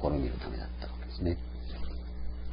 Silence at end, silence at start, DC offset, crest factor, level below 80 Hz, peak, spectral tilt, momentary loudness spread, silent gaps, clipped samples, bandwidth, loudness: 0 s; 0 s; under 0.1%; 20 dB; -38 dBFS; -14 dBFS; -11 dB/octave; 8 LU; none; under 0.1%; 5.2 kHz; -38 LUFS